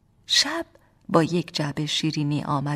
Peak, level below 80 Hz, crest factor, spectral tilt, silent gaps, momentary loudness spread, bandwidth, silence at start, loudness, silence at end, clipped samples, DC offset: -4 dBFS; -60 dBFS; 20 dB; -4 dB/octave; none; 8 LU; 15 kHz; 0.3 s; -23 LUFS; 0 s; under 0.1%; under 0.1%